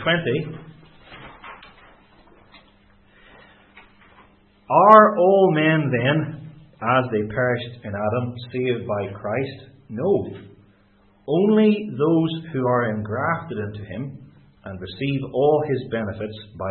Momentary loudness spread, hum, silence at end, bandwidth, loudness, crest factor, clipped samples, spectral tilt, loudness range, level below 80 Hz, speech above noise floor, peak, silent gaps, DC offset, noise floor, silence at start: 20 LU; none; 0 s; 4.4 kHz; -20 LUFS; 22 dB; under 0.1%; -9.5 dB/octave; 9 LU; -58 dBFS; 36 dB; 0 dBFS; none; under 0.1%; -57 dBFS; 0 s